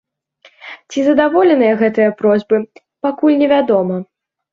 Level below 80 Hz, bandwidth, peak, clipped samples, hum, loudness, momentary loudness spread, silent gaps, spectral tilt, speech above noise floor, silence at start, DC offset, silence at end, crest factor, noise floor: -60 dBFS; 7.4 kHz; -2 dBFS; under 0.1%; none; -14 LUFS; 13 LU; none; -6.5 dB/octave; 37 dB; 0.65 s; under 0.1%; 0.5 s; 14 dB; -50 dBFS